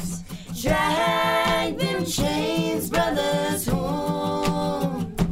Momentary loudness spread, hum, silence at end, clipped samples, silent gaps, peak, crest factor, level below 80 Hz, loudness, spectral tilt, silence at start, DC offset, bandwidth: 6 LU; none; 0 s; under 0.1%; none; -6 dBFS; 18 dB; -40 dBFS; -23 LUFS; -4.5 dB/octave; 0 s; under 0.1%; 16 kHz